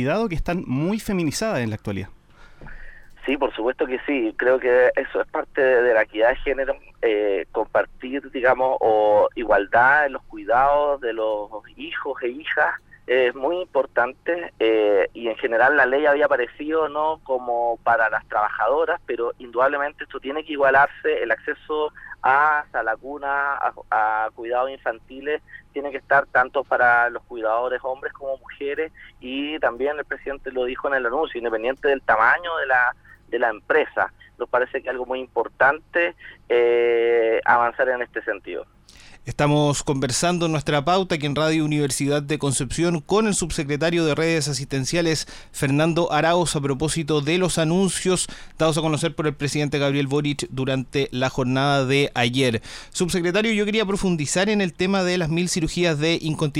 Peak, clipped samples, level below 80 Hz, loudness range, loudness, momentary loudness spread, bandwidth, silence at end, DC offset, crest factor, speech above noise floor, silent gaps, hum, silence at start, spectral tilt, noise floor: -2 dBFS; under 0.1%; -46 dBFS; 4 LU; -22 LUFS; 11 LU; 16 kHz; 0 s; under 0.1%; 18 dB; 25 dB; none; none; 0 s; -4.5 dB/octave; -47 dBFS